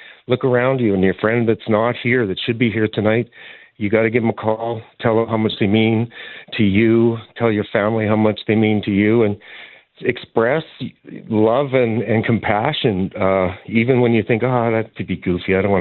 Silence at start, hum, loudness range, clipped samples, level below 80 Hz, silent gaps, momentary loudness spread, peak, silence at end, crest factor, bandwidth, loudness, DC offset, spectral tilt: 0.05 s; none; 2 LU; under 0.1%; -54 dBFS; none; 9 LU; 0 dBFS; 0 s; 16 dB; 4.3 kHz; -18 LUFS; under 0.1%; -12 dB/octave